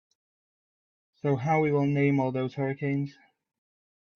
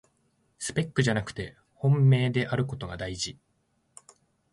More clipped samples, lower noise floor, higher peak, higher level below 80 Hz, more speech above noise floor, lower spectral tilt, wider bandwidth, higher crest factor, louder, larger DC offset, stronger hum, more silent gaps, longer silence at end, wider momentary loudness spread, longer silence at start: neither; first, under -90 dBFS vs -72 dBFS; second, -14 dBFS vs -10 dBFS; second, -70 dBFS vs -54 dBFS; first, over 64 dB vs 46 dB; first, -9 dB/octave vs -6 dB/octave; second, 6.6 kHz vs 11.5 kHz; about the same, 16 dB vs 18 dB; about the same, -27 LUFS vs -27 LUFS; neither; neither; neither; second, 1.05 s vs 1.2 s; second, 8 LU vs 15 LU; first, 1.25 s vs 0.6 s